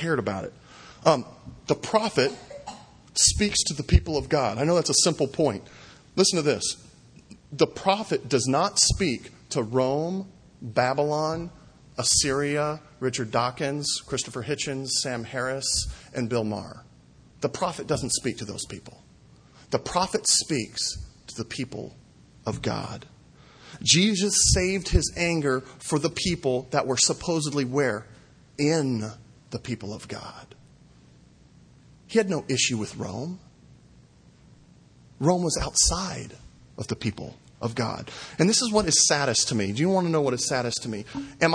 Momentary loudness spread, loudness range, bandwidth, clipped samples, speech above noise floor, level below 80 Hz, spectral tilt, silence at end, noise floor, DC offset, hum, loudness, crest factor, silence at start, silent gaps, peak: 17 LU; 7 LU; 10.5 kHz; under 0.1%; 29 dB; -40 dBFS; -3.5 dB/octave; 0 s; -54 dBFS; under 0.1%; none; -25 LUFS; 24 dB; 0 s; none; -2 dBFS